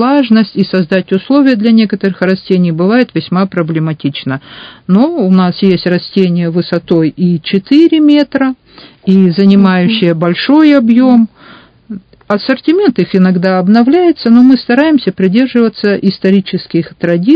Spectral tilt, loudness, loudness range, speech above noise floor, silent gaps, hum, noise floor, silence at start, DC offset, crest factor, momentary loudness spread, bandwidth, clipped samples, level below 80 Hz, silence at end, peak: -9 dB/octave; -10 LUFS; 3 LU; 29 dB; none; none; -38 dBFS; 0 s; under 0.1%; 10 dB; 9 LU; 5.2 kHz; 1%; -52 dBFS; 0 s; 0 dBFS